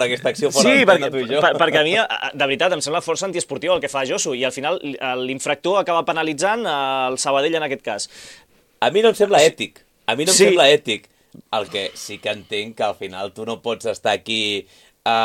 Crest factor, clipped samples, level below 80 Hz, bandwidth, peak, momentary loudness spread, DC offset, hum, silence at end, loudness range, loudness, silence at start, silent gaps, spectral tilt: 18 dB; under 0.1%; -64 dBFS; 16.5 kHz; 0 dBFS; 13 LU; under 0.1%; none; 0 s; 7 LU; -19 LUFS; 0 s; none; -2.5 dB/octave